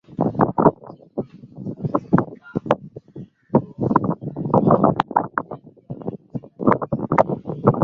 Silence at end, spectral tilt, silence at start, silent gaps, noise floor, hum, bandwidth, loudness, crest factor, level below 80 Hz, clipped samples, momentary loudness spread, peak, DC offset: 0 s; -10 dB/octave; 0.1 s; none; -40 dBFS; none; 6.8 kHz; -21 LUFS; 20 dB; -50 dBFS; under 0.1%; 19 LU; 0 dBFS; under 0.1%